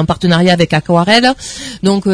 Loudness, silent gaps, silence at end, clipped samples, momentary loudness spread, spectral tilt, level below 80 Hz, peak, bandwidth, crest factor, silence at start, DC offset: -11 LUFS; none; 0 s; 0.3%; 9 LU; -5.5 dB/octave; -38 dBFS; 0 dBFS; 11 kHz; 12 dB; 0 s; under 0.1%